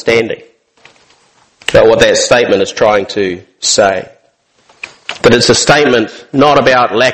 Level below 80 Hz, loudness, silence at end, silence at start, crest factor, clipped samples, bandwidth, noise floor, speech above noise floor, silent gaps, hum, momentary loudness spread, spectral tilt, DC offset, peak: -40 dBFS; -9 LUFS; 0 s; 0.05 s; 10 dB; 0.9%; 12.5 kHz; -54 dBFS; 44 dB; none; none; 14 LU; -3 dB/octave; under 0.1%; 0 dBFS